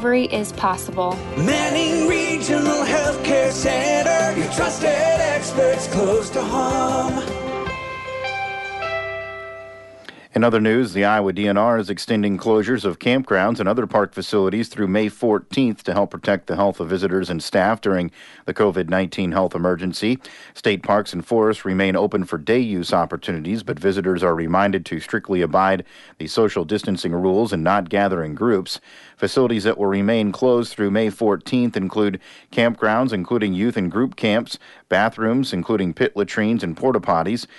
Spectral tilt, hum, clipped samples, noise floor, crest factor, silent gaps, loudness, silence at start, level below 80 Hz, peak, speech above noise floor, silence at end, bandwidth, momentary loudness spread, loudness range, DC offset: -5 dB/octave; none; under 0.1%; -42 dBFS; 16 dB; none; -20 LUFS; 0 s; -48 dBFS; -4 dBFS; 22 dB; 0.15 s; 11.5 kHz; 7 LU; 3 LU; under 0.1%